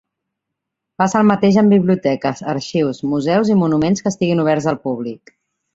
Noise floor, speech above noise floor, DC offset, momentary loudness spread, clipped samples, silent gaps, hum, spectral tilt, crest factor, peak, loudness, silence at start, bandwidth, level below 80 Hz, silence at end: -80 dBFS; 64 dB; under 0.1%; 9 LU; under 0.1%; none; none; -6.5 dB/octave; 16 dB; 0 dBFS; -16 LUFS; 1 s; 7.8 kHz; -54 dBFS; 0.6 s